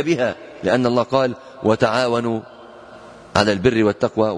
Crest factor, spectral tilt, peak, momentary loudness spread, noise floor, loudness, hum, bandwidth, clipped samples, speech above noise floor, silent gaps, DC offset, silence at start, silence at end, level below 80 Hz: 20 dB; -6 dB/octave; 0 dBFS; 7 LU; -41 dBFS; -19 LUFS; none; 10.5 kHz; under 0.1%; 23 dB; none; under 0.1%; 0 s; 0 s; -50 dBFS